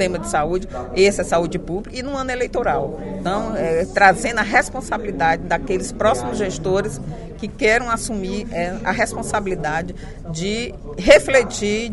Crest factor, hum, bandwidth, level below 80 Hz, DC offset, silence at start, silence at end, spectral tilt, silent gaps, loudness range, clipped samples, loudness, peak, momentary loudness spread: 20 dB; none; 11.5 kHz; -36 dBFS; under 0.1%; 0 s; 0 s; -4.5 dB/octave; none; 3 LU; under 0.1%; -19 LUFS; 0 dBFS; 13 LU